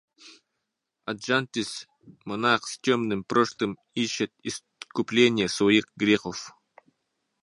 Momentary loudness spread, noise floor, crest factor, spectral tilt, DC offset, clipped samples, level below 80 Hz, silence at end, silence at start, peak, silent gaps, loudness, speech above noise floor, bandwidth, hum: 15 LU; -82 dBFS; 22 dB; -4 dB/octave; under 0.1%; under 0.1%; -66 dBFS; 0.95 s; 0.25 s; -6 dBFS; none; -26 LUFS; 56 dB; 11.5 kHz; none